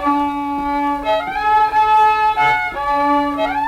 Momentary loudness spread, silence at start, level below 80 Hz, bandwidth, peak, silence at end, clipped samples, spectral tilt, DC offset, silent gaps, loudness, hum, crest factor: 7 LU; 0 s; -42 dBFS; 14.5 kHz; -6 dBFS; 0 s; under 0.1%; -5 dB/octave; under 0.1%; none; -16 LUFS; none; 10 dB